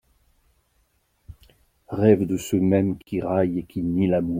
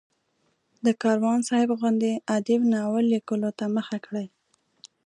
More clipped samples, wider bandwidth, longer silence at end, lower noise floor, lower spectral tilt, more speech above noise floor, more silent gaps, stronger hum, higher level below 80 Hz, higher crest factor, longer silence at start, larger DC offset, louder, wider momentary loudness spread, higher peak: neither; first, 16 kHz vs 11 kHz; second, 0 s vs 0.8 s; second, -67 dBFS vs -71 dBFS; first, -8 dB/octave vs -5.5 dB/octave; about the same, 46 dB vs 47 dB; neither; neither; first, -52 dBFS vs -74 dBFS; about the same, 20 dB vs 16 dB; first, 1.3 s vs 0.85 s; neither; first, -22 LUFS vs -25 LUFS; about the same, 8 LU vs 9 LU; first, -4 dBFS vs -10 dBFS